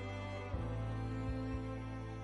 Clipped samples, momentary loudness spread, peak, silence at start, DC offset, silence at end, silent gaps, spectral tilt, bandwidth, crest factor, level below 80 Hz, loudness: under 0.1%; 3 LU; -28 dBFS; 0 s; under 0.1%; 0 s; none; -7.5 dB/octave; 11 kHz; 12 dB; -48 dBFS; -42 LUFS